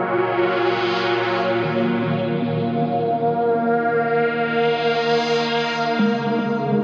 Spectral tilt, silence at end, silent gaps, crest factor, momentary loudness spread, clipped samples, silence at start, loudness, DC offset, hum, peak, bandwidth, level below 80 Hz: -6.5 dB/octave; 0 s; none; 14 dB; 3 LU; under 0.1%; 0 s; -20 LUFS; under 0.1%; none; -6 dBFS; 7.4 kHz; -64 dBFS